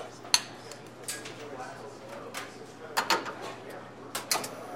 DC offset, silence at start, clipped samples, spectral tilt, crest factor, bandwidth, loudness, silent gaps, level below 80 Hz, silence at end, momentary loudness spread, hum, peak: under 0.1%; 0 s; under 0.1%; -1 dB/octave; 34 dB; 16.5 kHz; -33 LUFS; none; -72 dBFS; 0 s; 17 LU; none; -2 dBFS